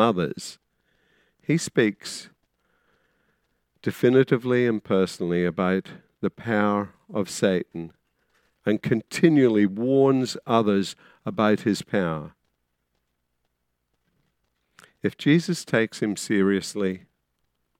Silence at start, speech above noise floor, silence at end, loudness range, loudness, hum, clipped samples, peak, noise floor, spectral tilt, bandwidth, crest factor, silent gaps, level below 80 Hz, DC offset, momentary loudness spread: 0 s; 53 dB; 0.8 s; 8 LU; -24 LUFS; none; under 0.1%; -4 dBFS; -76 dBFS; -6 dB/octave; 16 kHz; 22 dB; none; -66 dBFS; under 0.1%; 15 LU